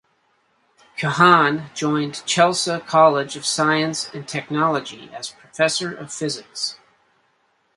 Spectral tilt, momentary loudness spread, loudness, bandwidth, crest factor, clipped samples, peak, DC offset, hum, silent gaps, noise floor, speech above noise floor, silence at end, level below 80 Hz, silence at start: -3.5 dB/octave; 14 LU; -19 LUFS; 11.5 kHz; 20 dB; under 0.1%; 0 dBFS; under 0.1%; none; none; -65 dBFS; 45 dB; 1.05 s; -66 dBFS; 0.95 s